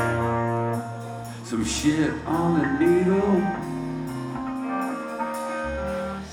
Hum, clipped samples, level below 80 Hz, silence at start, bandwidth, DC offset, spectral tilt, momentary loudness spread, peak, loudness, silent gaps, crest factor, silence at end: none; under 0.1%; -46 dBFS; 0 s; 16.5 kHz; under 0.1%; -6 dB/octave; 10 LU; -10 dBFS; -25 LUFS; none; 16 dB; 0 s